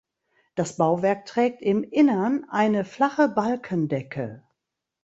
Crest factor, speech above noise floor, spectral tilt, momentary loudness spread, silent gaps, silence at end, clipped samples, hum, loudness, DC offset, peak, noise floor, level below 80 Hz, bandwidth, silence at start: 18 dB; 60 dB; -6.5 dB/octave; 10 LU; none; 0.65 s; under 0.1%; none; -24 LUFS; under 0.1%; -6 dBFS; -83 dBFS; -66 dBFS; 8.2 kHz; 0.55 s